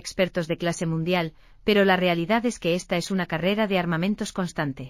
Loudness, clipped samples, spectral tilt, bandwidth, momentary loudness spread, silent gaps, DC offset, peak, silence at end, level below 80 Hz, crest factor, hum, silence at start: -24 LUFS; under 0.1%; -5.5 dB/octave; 15 kHz; 8 LU; none; under 0.1%; -8 dBFS; 0 s; -52 dBFS; 18 dB; none; 0.05 s